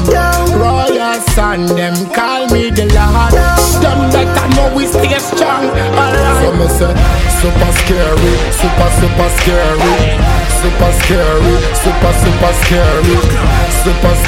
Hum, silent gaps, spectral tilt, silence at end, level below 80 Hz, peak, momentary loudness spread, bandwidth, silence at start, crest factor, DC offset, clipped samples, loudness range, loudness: none; none; -5 dB/octave; 0 s; -14 dBFS; 0 dBFS; 3 LU; 17 kHz; 0 s; 10 dB; under 0.1%; under 0.1%; 1 LU; -11 LUFS